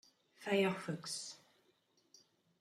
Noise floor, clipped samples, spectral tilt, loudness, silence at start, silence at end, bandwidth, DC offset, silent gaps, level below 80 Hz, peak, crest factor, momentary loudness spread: -76 dBFS; under 0.1%; -4.5 dB/octave; -39 LUFS; 0.4 s; 1.25 s; 14.5 kHz; under 0.1%; none; -86 dBFS; -22 dBFS; 20 dB; 15 LU